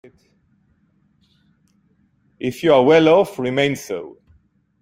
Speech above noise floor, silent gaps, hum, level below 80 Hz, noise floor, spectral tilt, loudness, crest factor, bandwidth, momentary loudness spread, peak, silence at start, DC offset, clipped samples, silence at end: 44 dB; none; none; -58 dBFS; -61 dBFS; -5.5 dB/octave; -17 LUFS; 20 dB; 16 kHz; 17 LU; 0 dBFS; 2.4 s; under 0.1%; under 0.1%; 0.7 s